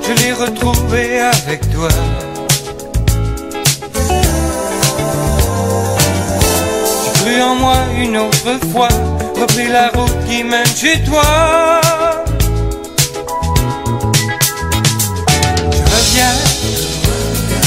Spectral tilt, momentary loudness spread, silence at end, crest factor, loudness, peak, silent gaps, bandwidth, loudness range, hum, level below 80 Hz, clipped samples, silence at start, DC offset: -4 dB/octave; 6 LU; 0 s; 14 dB; -13 LUFS; 0 dBFS; none; 16.5 kHz; 3 LU; none; -22 dBFS; under 0.1%; 0 s; under 0.1%